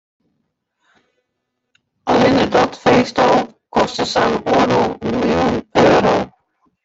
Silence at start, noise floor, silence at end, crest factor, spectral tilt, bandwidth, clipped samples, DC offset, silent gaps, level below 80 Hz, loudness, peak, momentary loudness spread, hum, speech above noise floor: 2.05 s; -74 dBFS; 0.55 s; 16 dB; -5.5 dB/octave; 8 kHz; under 0.1%; under 0.1%; none; -46 dBFS; -15 LUFS; -2 dBFS; 7 LU; none; 59 dB